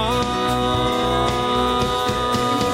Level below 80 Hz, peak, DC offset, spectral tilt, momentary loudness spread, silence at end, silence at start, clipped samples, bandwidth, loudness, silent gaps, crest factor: -34 dBFS; -8 dBFS; under 0.1%; -4.5 dB/octave; 1 LU; 0 s; 0 s; under 0.1%; 16.5 kHz; -20 LUFS; none; 12 dB